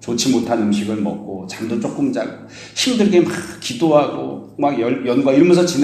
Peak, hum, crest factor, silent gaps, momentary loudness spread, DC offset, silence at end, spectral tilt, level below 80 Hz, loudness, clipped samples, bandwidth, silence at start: 0 dBFS; none; 16 dB; none; 14 LU; under 0.1%; 0 s; -5 dB/octave; -58 dBFS; -17 LUFS; under 0.1%; 14 kHz; 0 s